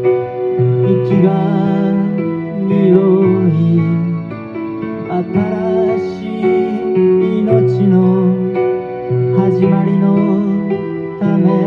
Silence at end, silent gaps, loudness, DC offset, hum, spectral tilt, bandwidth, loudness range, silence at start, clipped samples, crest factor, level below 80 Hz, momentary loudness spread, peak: 0 s; none; -14 LUFS; under 0.1%; none; -11 dB/octave; 4.8 kHz; 3 LU; 0 s; under 0.1%; 12 dB; -52 dBFS; 8 LU; 0 dBFS